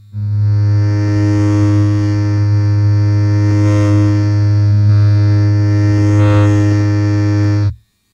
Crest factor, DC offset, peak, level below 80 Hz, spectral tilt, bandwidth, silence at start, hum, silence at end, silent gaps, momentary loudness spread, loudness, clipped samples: 10 dB; under 0.1%; 0 dBFS; -40 dBFS; -8.5 dB/octave; 7.2 kHz; 0.15 s; none; 0.4 s; none; 4 LU; -12 LUFS; under 0.1%